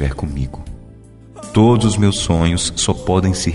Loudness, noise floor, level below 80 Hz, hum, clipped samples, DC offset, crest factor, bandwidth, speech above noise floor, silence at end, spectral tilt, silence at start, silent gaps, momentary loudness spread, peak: -16 LUFS; -40 dBFS; -30 dBFS; none; under 0.1%; under 0.1%; 14 dB; 11.5 kHz; 25 dB; 0 s; -5 dB/octave; 0 s; none; 16 LU; -4 dBFS